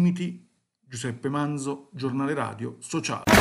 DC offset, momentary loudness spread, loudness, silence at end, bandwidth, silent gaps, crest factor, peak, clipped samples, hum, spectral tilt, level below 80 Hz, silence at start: under 0.1%; 9 LU; -28 LUFS; 0 s; 13 kHz; none; 22 dB; -4 dBFS; under 0.1%; none; -5 dB/octave; -52 dBFS; 0 s